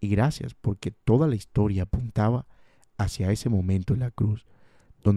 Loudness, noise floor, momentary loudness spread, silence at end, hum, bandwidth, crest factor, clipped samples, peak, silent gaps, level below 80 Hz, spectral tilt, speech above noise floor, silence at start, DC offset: -26 LUFS; -55 dBFS; 8 LU; 0 s; none; 12.5 kHz; 18 dB; under 0.1%; -8 dBFS; none; -42 dBFS; -8 dB/octave; 30 dB; 0 s; under 0.1%